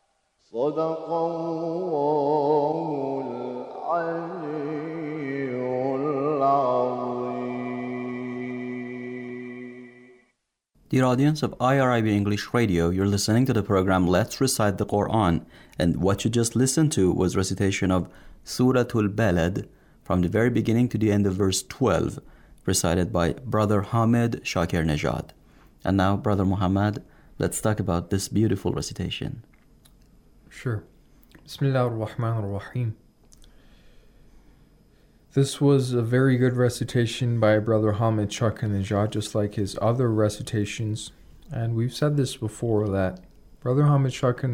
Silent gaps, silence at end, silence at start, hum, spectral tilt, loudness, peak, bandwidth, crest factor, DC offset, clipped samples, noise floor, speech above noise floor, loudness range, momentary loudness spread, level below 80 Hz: none; 0 s; 0.55 s; none; -6 dB/octave; -24 LUFS; -8 dBFS; 17 kHz; 16 dB; under 0.1%; under 0.1%; -73 dBFS; 50 dB; 7 LU; 11 LU; -52 dBFS